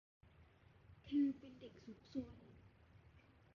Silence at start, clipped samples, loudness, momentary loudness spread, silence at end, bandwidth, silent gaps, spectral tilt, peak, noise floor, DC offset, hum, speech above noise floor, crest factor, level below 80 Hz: 0.9 s; under 0.1%; -44 LUFS; 28 LU; 1.1 s; 6.4 kHz; none; -7 dB/octave; -30 dBFS; -68 dBFS; under 0.1%; none; 24 dB; 18 dB; -72 dBFS